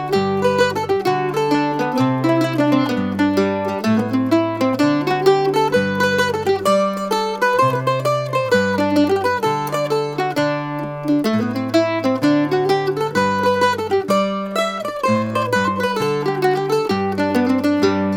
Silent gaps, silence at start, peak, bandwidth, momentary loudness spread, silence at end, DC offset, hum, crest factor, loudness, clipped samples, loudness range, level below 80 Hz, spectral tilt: none; 0 s; -2 dBFS; 17.5 kHz; 4 LU; 0 s; under 0.1%; none; 16 dB; -18 LUFS; under 0.1%; 2 LU; -56 dBFS; -6 dB/octave